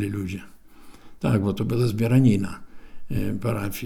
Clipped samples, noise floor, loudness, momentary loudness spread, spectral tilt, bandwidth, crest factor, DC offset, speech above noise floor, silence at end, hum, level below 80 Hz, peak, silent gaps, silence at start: under 0.1%; -44 dBFS; -24 LUFS; 15 LU; -7.5 dB/octave; 18.5 kHz; 18 dB; under 0.1%; 21 dB; 0 s; none; -42 dBFS; -6 dBFS; none; 0 s